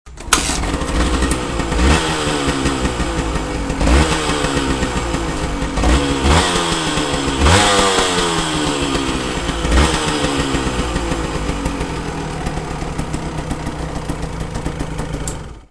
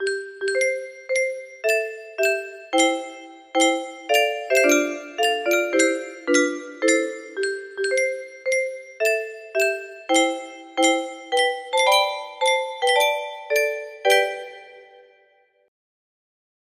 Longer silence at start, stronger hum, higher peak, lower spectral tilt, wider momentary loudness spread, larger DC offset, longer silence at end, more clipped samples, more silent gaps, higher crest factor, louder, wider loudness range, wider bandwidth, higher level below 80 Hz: about the same, 0.05 s vs 0 s; neither; first, 0 dBFS vs -4 dBFS; first, -4 dB/octave vs 0 dB/octave; about the same, 11 LU vs 9 LU; first, 0.3% vs under 0.1%; second, 0.1 s vs 1.85 s; neither; neither; about the same, 18 dB vs 18 dB; first, -18 LUFS vs -22 LUFS; first, 9 LU vs 3 LU; second, 11 kHz vs 15.5 kHz; first, -24 dBFS vs -74 dBFS